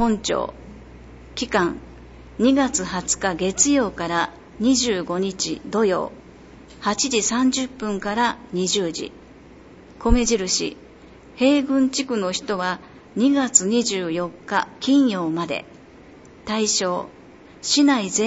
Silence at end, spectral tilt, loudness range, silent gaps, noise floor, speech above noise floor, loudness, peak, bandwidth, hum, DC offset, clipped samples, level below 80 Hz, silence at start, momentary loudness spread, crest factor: 0 s; -3 dB/octave; 3 LU; none; -45 dBFS; 24 dB; -21 LUFS; -2 dBFS; 8.2 kHz; none; under 0.1%; under 0.1%; -38 dBFS; 0 s; 12 LU; 20 dB